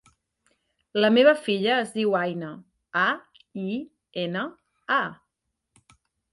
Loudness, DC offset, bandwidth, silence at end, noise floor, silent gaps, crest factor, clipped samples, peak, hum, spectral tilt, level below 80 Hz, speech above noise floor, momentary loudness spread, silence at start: -24 LUFS; under 0.1%; 11.5 kHz; 1.2 s; -81 dBFS; none; 20 dB; under 0.1%; -6 dBFS; none; -5.5 dB/octave; -74 dBFS; 57 dB; 18 LU; 0.95 s